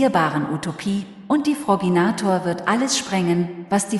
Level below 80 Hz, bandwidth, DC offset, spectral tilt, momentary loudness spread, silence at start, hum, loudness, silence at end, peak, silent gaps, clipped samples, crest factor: -60 dBFS; 12 kHz; under 0.1%; -5 dB/octave; 7 LU; 0 s; none; -21 LUFS; 0 s; -4 dBFS; none; under 0.1%; 16 dB